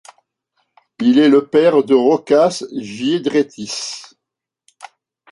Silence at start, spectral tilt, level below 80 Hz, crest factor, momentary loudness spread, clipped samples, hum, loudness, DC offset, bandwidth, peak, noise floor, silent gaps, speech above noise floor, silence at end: 1 s; -5 dB/octave; -64 dBFS; 14 dB; 13 LU; under 0.1%; none; -15 LUFS; under 0.1%; 11.5 kHz; -2 dBFS; -82 dBFS; none; 68 dB; 0.45 s